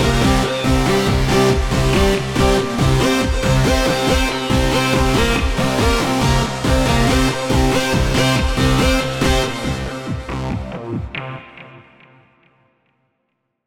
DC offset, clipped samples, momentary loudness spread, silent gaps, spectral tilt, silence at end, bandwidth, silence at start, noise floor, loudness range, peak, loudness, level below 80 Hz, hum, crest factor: under 0.1%; under 0.1%; 10 LU; none; -5 dB/octave; 1.9 s; 17.5 kHz; 0 s; -71 dBFS; 11 LU; -2 dBFS; -17 LUFS; -24 dBFS; none; 14 dB